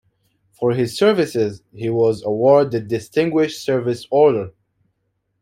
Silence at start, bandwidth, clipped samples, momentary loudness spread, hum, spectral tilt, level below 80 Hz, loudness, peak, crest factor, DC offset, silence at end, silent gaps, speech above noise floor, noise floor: 0.6 s; 15 kHz; under 0.1%; 9 LU; none; -6.5 dB/octave; -60 dBFS; -18 LUFS; -2 dBFS; 16 dB; under 0.1%; 0.9 s; none; 53 dB; -71 dBFS